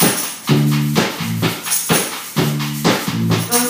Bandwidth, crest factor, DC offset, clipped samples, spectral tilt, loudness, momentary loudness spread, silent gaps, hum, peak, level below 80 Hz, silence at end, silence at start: 16 kHz; 16 dB; under 0.1%; under 0.1%; -4 dB/octave; -17 LUFS; 5 LU; none; none; 0 dBFS; -52 dBFS; 0 s; 0 s